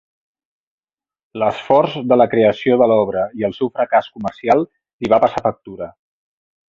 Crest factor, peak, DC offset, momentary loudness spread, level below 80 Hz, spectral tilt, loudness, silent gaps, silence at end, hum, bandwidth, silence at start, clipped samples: 16 dB; -2 dBFS; under 0.1%; 16 LU; -54 dBFS; -7.5 dB/octave; -16 LUFS; 4.93-4.99 s; 0.8 s; none; 7.4 kHz; 1.35 s; under 0.1%